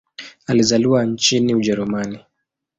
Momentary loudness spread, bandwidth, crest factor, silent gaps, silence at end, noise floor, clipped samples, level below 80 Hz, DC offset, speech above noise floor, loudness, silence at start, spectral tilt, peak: 18 LU; 8 kHz; 16 dB; none; 0.6 s; -77 dBFS; under 0.1%; -54 dBFS; under 0.1%; 60 dB; -17 LUFS; 0.2 s; -4.5 dB/octave; -2 dBFS